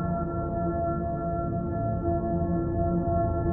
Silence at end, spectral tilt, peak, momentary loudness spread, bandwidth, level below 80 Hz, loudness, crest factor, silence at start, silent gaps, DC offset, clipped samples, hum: 0 s; -14 dB/octave; -14 dBFS; 3 LU; 1.9 kHz; -38 dBFS; -28 LUFS; 12 dB; 0 s; none; under 0.1%; under 0.1%; none